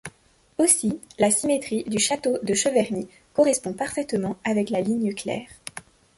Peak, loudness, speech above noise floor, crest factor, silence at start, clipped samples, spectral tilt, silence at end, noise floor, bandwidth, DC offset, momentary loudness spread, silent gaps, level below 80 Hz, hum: -4 dBFS; -23 LUFS; 36 dB; 20 dB; 0.05 s; under 0.1%; -3.5 dB/octave; 0.4 s; -59 dBFS; 12 kHz; under 0.1%; 14 LU; none; -60 dBFS; none